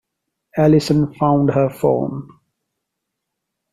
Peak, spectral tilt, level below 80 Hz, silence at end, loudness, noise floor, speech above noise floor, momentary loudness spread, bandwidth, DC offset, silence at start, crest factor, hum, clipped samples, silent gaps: -4 dBFS; -8 dB/octave; -48 dBFS; 1.5 s; -17 LUFS; -79 dBFS; 63 dB; 12 LU; 13.5 kHz; under 0.1%; 0.55 s; 16 dB; none; under 0.1%; none